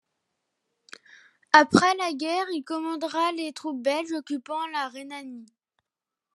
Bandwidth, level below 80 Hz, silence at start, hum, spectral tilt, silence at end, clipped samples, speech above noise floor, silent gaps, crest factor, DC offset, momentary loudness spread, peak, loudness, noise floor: 12.5 kHz; -74 dBFS; 1.55 s; none; -4 dB/octave; 0.9 s; under 0.1%; 63 dB; none; 26 dB; under 0.1%; 19 LU; 0 dBFS; -25 LUFS; -89 dBFS